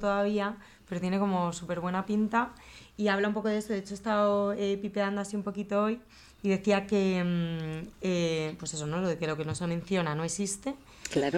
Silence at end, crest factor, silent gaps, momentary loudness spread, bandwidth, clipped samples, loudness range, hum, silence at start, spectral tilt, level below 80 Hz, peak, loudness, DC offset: 0 s; 16 dB; none; 9 LU; 13 kHz; under 0.1%; 2 LU; none; 0 s; -5.5 dB/octave; -60 dBFS; -14 dBFS; -31 LUFS; under 0.1%